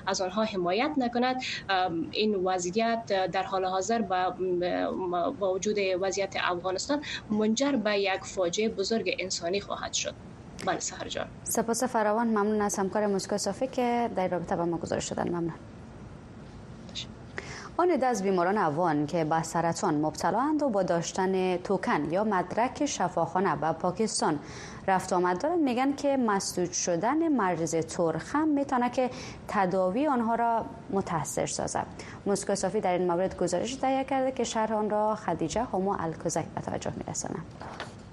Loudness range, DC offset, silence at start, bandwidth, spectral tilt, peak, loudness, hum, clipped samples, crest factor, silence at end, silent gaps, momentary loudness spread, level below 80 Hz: 3 LU; under 0.1%; 0 s; 12.5 kHz; -4.5 dB/octave; -10 dBFS; -29 LUFS; none; under 0.1%; 18 dB; 0 s; none; 9 LU; -56 dBFS